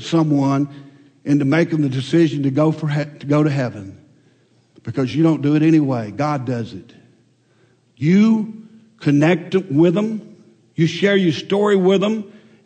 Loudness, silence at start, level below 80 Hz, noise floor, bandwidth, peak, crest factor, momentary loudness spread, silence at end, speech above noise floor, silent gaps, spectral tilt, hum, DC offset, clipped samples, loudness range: -18 LUFS; 0 s; -66 dBFS; -57 dBFS; 8.8 kHz; -4 dBFS; 14 dB; 13 LU; 0.35 s; 40 dB; none; -7.5 dB/octave; none; under 0.1%; under 0.1%; 3 LU